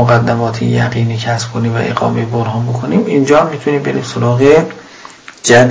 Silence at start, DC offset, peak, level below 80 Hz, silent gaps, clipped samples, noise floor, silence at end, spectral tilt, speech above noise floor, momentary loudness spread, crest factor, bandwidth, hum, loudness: 0 s; under 0.1%; 0 dBFS; -44 dBFS; none; 0.3%; -35 dBFS; 0 s; -6 dB/octave; 23 dB; 9 LU; 12 dB; 8 kHz; none; -13 LUFS